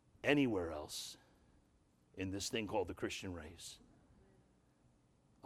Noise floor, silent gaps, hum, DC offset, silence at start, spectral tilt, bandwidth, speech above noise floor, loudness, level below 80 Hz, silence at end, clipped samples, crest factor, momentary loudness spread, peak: -73 dBFS; none; none; under 0.1%; 0.25 s; -4.5 dB/octave; 15.5 kHz; 33 dB; -40 LUFS; -66 dBFS; 1.7 s; under 0.1%; 26 dB; 19 LU; -18 dBFS